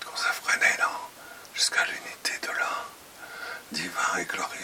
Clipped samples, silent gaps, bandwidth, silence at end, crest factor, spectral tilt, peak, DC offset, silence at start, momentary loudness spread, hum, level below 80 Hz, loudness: under 0.1%; none; 17 kHz; 0 s; 22 dB; 0 dB/octave; -8 dBFS; under 0.1%; 0 s; 19 LU; none; -72 dBFS; -27 LUFS